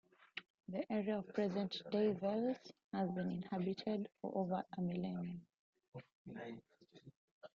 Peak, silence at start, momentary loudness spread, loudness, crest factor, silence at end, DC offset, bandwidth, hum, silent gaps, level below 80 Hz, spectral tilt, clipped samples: -24 dBFS; 0.2 s; 17 LU; -42 LUFS; 18 dB; 0.1 s; under 0.1%; 7 kHz; none; 0.50-0.58 s, 2.84-2.91 s, 5.59-5.73 s, 5.88-5.92 s, 6.15-6.25 s, 7.16-7.41 s; -80 dBFS; -6 dB/octave; under 0.1%